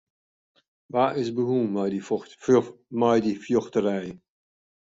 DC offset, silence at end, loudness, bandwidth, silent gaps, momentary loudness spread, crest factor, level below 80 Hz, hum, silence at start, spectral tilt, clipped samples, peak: under 0.1%; 0.65 s; -25 LUFS; 7.8 kHz; none; 9 LU; 18 dB; -66 dBFS; none; 0.95 s; -7 dB/octave; under 0.1%; -8 dBFS